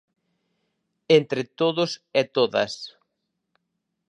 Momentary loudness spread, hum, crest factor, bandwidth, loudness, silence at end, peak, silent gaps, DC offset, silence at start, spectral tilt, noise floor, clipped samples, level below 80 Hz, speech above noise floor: 10 LU; none; 22 dB; 10 kHz; -23 LUFS; 1.2 s; -4 dBFS; none; under 0.1%; 1.1 s; -5 dB/octave; -79 dBFS; under 0.1%; -72 dBFS; 56 dB